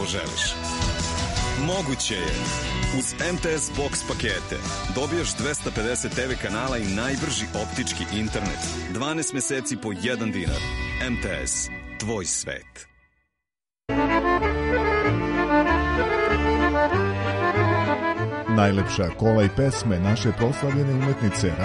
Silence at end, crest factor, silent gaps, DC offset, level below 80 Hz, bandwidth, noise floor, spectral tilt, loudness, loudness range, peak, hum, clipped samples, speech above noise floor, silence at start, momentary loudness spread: 0 s; 18 dB; none; under 0.1%; -36 dBFS; 11.5 kHz; -88 dBFS; -4.5 dB/octave; -24 LUFS; 5 LU; -6 dBFS; none; under 0.1%; 63 dB; 0 s; 7 LU